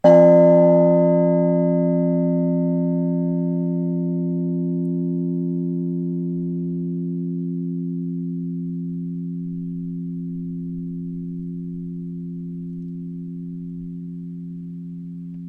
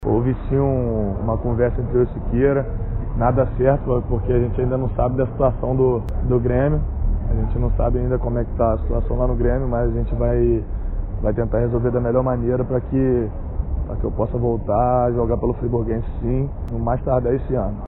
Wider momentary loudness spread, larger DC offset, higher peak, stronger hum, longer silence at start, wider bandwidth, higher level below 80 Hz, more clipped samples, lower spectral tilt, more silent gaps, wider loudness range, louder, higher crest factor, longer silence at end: first, 17 LU vs 6 LU; neither; about the same, -2 dBFS vs -4 dBFS; neither; about the same, 0.05 s vs 0 s; about the same, 3.2 kHz vs 3.3 kHz; second, -56 dBFS vs -24 dBFS; neither; about the same, -11.5 dB/octave vs -11 dB/octave; neither; first, 13 LU vs 1 LU; about the same, -21 LUFS vs -21 LUFS; about the same, 18 dB vs 16 dB; about the same, 0 s vs 0 s